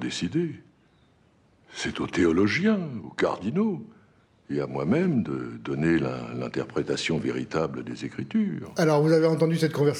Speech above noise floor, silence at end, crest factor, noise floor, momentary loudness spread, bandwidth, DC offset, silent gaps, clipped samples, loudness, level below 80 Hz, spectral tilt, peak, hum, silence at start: 36 dB; 0 s; 18 dB; -61 dBFS; 12 LU; 14 kHz; under 0.1%; none; under 0.1%; -26 LUFS; -58 dBFS; -6.5 dB/octave; -8 dBFS; none; 0 s